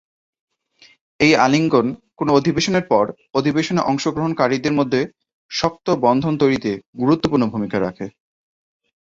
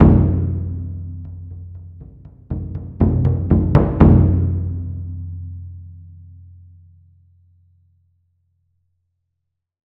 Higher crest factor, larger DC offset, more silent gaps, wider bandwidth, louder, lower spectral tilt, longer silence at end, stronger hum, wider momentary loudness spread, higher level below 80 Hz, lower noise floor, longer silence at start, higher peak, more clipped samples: about the same, 18 dB vs 18 dB; neither; first, 5.34-5.49 s, 6.87-6.93 s vs none; first, 7.8 kHz vs 3.3 kHz; about the same, -19 LUFS vs -18 LUFS; second, -5.5 dB/octave vs -12.5 dB/octave; second, 0.95 s vs 3.65 s; neither; second, 10 LU vs 25 LU; second, -52 dBFS vs -30 dBFS; second, -53 dBFS vs -77 dBFS; first, 1.2 s vs 0 s; about the same, -2 dBFS vs -2 dBFS; neither